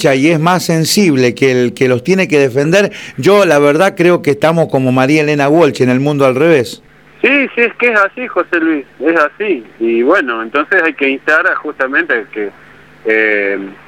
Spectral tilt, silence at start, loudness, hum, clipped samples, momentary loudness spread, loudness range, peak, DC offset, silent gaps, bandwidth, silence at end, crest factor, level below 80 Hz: -5.5 dB/octave; 0 s; -11 LUFS; none; under 0.1%; 7 LU; 3 LU; 0 dBFS; 0.2%; none; 18 kHz; 0.15 s; 12 dB; -54 dBFS